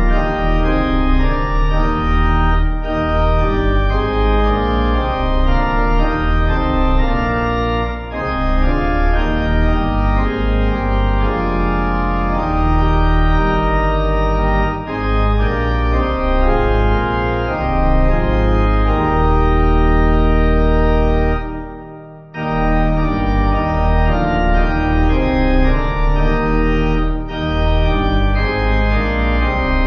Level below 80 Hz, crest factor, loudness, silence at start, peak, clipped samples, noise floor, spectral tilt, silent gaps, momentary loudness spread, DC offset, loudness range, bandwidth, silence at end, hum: -16 dBFS; 12 dB; -17 LUFS; 0 s; -2 dBFS; under 0.1%; -34 dBFS; -8.5 dB/octave; none; 3 LU; under 0.1%; 2 LU; 6 kHz; 0 s; none